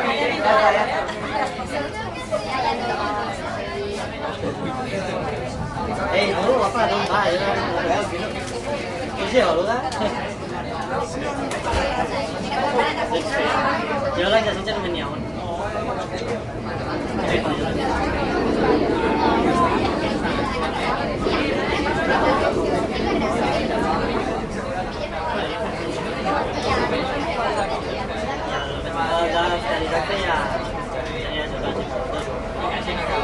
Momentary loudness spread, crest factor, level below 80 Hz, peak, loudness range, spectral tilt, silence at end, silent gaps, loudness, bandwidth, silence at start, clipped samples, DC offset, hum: 8 LU; 18 dB; -38 dBFS; -4 dBFS; 4 LU; -5 dB/octave; 0 s; none; -22 LUFS; 11.5 kHz; 0 s; under 0.1%; under 0.1%; none